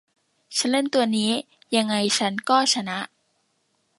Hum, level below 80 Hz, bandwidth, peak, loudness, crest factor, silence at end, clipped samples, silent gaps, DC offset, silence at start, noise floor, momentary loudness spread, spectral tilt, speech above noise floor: none; -74 dBFS; 11.5 kHz; -4 dBFS; -22 LUFS; 20 dB; 0.9 s; under 0.1%; none; under 0.1%; 0.5 s; -70 dBFS; 9 LU; -3 dB/octave; 48 dB